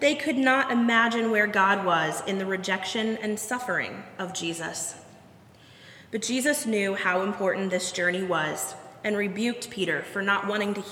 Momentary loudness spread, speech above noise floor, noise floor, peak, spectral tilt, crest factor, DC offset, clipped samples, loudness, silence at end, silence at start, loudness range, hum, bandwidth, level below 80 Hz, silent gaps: 10 LU; 26 dB; -52 dBFS; -8 dBFS; -3.5 dB/octave; 18 dB; under 0.1%; under 0.1%; -26 LUFS; 0 s; 0 s; 7 LU; none; 17.5 kHz; -72 dBFS; none